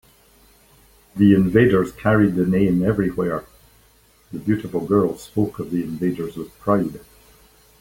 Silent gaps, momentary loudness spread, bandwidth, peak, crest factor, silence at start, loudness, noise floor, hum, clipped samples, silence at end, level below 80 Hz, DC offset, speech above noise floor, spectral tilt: none; 13 LU; 17 kHz; -2 dBFS; 20 dB; 1.15 s; -20 LUFS; -55 dBFS; none; under 0.1%; 0.8 s; -46 dBFS; under 0.1%; 36 dB; -8.5 dB/octave